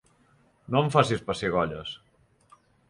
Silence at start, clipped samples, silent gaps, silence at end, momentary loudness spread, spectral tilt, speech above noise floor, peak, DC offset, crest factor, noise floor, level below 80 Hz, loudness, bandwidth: 0.7 s; under 0.1%; none; 0.95 s; 16 LU; -6 dB/octave; 37 dB; -6 dBFS; under 0.1%; 22 dB; -63 dBFS; -56 dBFS; -26 LUFS; 11.5 kHz